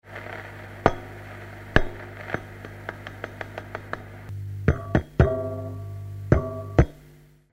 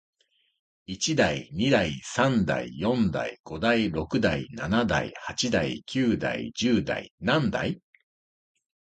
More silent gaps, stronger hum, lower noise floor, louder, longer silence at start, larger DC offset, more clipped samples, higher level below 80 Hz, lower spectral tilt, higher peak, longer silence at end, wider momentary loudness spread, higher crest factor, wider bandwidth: second, none vs 3.40-3.44 s, 7.11-7.18 s; first, 50 Hz at -45 dBFS vs none; second, -52 dBFS vs under -90 dBFS; about the same, -28 LUFS vs -26 LUFS; second, 0.05 s vs 0.9 s; neither; neither; first, -34 dBFS vs -50 dBFS; first, -8 dB/octave vs -5 dB/octave; first, -2 dBFS vs -8 dBFS; second, 0.25 s vs 1.1 s; first, 16 LU vs 8 LU; first, 26 dB vs 20 dB; first, 16 kHz vs 9.2 kHz